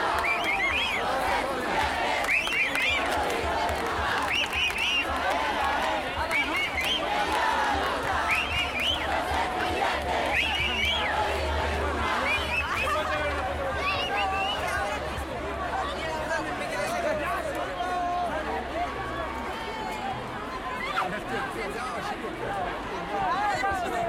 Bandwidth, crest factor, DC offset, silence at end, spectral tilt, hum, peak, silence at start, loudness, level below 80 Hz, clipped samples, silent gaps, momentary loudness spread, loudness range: 16.5 kHz; 18 dB; under 0.1%; 0 s; -3.5 dB/octave; none; -10 dBFS; 0 s; -27 LUFS; -44 dBFS; under 0.1%; none; 8 LU; 6 LU